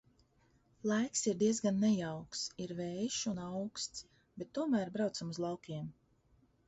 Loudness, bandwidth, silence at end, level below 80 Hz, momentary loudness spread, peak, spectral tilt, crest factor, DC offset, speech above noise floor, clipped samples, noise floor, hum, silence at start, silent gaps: -37 LUFS; 8 kHz; 0.75 s; -72 dBFS; 12 LU; -20 dBFS; -5.5 dB/octave; 16 dB; under 0.1%; 35 dB; under 0.1%; -71 dBFS; none; 0.85 s; none